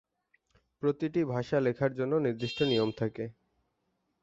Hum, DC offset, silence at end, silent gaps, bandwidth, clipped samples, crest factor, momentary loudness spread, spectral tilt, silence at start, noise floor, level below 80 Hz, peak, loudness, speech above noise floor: none; under 0.1%; 0.9 s; none; 7.8 kHz; under 0.1%; 16 dB; 7 LU; -7 dB/octave; 0.8 s; -79 dBFS; -66 dBFS; -16 dBFS; -31 LUFS; 49 dB